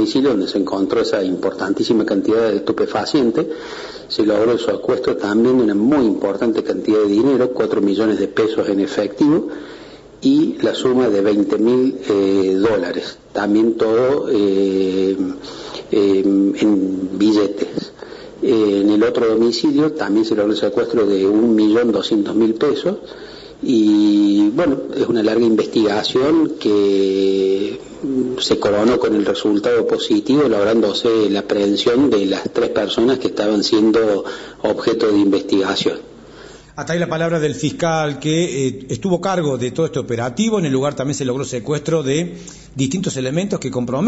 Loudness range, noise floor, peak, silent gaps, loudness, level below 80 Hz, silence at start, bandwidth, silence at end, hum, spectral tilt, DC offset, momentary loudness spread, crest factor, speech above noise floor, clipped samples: 4 LU; -39 dBFS; -4 dBFS; none; -17 LUFS; -52 dBFS; 0 s; 8 kHz; 0 s; none; -5.5 dB/octave; under 0.1%; 8 LU; 12 dB; 23 dB; under 0.1%